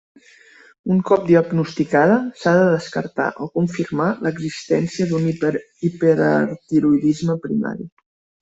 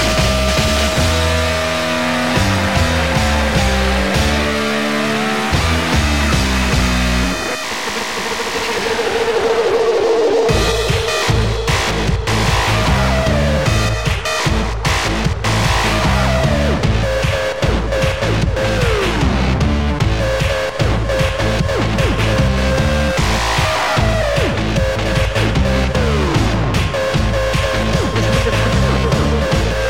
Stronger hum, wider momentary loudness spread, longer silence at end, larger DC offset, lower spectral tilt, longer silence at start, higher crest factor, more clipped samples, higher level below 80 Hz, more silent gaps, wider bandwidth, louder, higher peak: neither; first, 9 LU vs 3 LU; first, 0.55 s vs 0 s; second, under 0.1% vs 2%; first, -7.5 dB/octave vs -5 dB/octave; first, 0.85 s vs 0 s; about the same, 16 dB vs 14 dB; neither; second, -58 dBFS vs -22 dBFS; neither; second, 8 kHz vs 17 kHz; second, -19 LUFS vs -16 LUFS; about the same, -2 dBFS vs -2 dBFS